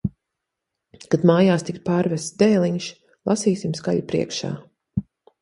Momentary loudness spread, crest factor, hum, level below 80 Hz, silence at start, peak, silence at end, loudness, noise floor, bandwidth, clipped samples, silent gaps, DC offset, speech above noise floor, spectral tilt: 13 LU; 20 dB; none; -52 dBFS; 0.05 s; -4 dBFS; 0.4 s; -22 LUFS; -82 dBFS; 11.5 kHz; under 0.1%; none; under 0.1%; 62 dB; -6 dB/octave